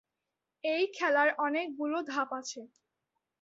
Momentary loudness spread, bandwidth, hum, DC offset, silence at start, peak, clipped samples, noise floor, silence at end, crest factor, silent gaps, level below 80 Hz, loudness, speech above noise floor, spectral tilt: 12 LU; 7.8 kHz; none; under 0.1%; 0.65 s; -16 dBFS; under 0.1%; -88 dBFS; 0.75 s; 18 dB; none; -84 dBFS; -31 LUFS; 56 dB; -1.5 dB/octave